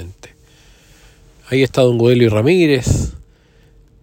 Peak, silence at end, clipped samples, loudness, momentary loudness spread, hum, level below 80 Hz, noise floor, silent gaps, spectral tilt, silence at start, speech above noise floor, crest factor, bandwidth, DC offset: 0 dBFS; 0.85 s; under 0.1%; -14 LUFS; 9 LU; none; -34 dBFS; -49 dBFS; none; -6.5 dB/octave; 0 s; 37 dB; 16 dB; 16.5 kHz; under 0.1%